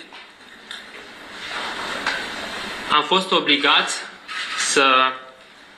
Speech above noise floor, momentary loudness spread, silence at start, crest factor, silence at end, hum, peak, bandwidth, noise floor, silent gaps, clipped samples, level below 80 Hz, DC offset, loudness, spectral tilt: 27 dB; 21 LU; 0 s; 20 dB; 0.15 s; none; -4 dBFS; 14 kHz; -45 dBFS; none; under 0.1%; -60 dBFS; under 0.1%; -19 LUFS; -1.5 dB/octave